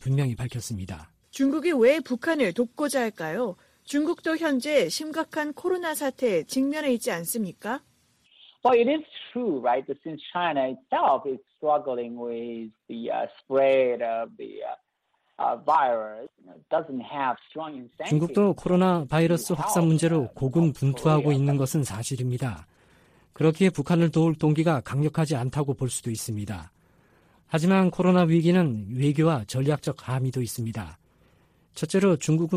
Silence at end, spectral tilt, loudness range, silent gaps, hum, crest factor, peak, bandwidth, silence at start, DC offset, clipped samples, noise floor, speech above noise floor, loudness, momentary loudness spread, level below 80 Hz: 0 s; -6.5 dB/octave; 5 LU; none; none; 16 dB; -8 dBFS; 15.5 kHz; 0 s; under 0.1%; under 0.1%; -73 dBFS; 48 dB; -25 LUFS; 14 LU; -58 dBFS